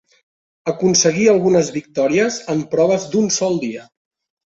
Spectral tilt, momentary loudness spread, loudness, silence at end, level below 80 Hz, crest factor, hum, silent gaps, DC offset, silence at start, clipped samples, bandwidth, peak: -4 dB/octave; 11 LU; -17 LUFS; 0.65 s; -58 dBFS; 16 dB; none; none; under 0.1%; 0.65 s; under 0.1%; 8 kHz; -2 dBFS